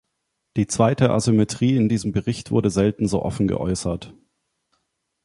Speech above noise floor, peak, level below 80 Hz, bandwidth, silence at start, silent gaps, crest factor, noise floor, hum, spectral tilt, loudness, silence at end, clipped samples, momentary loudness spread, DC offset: 56 dB; -2 dBFS; -44 dBFS; 11.5 kHz; 0.55 s; none; 20 dB; -76 dBFS; none; -6.5 dB/octave; -21 LUFS; 1.15 s; under 0.1%; 8 LU; under 0.1%